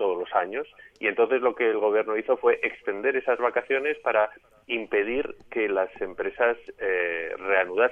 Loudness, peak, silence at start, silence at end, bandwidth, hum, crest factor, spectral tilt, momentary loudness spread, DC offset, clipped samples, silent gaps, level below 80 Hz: -26 LUFS; -8 dBFS; 0 s; 0 s; 3.6 kHz; none; 18 dB; -6 dB/octave; 8 LU; under 0.1%; under 0.1%; none; -62 dBFS